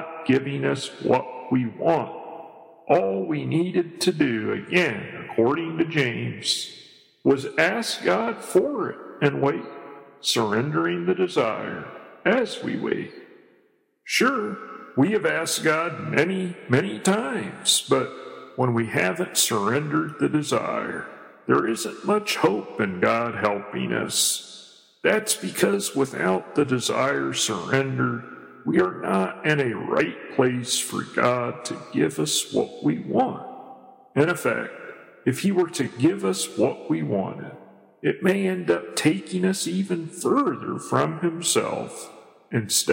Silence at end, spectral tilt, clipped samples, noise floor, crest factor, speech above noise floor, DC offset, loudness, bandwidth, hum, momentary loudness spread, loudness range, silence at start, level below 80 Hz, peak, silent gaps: 0 s; -4 dB/octave; under 0.1%; -64 dBFS; 20 dB; 40 dB; under 0.1%; -24 LUFS; 16.5 kHz; none; 10 LU; 2 LU; 0 s; -68 dBFS; -4 dBFS; none